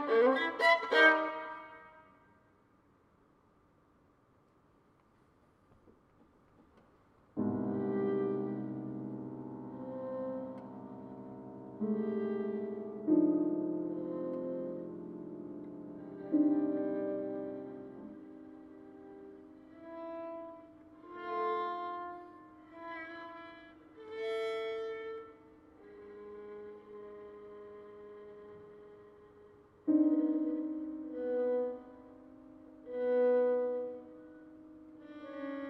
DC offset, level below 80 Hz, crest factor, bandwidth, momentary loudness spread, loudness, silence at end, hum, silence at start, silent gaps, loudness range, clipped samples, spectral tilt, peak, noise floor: under 0.1%; -76 dBFS; 26 dB; 9.2 kHz; 25 LU; -34 LUFS; 0 s; none; 0 s; none; 14 LU; under 0.1%; -6.5 dB/octave; -12 dBFS; -68 dBFS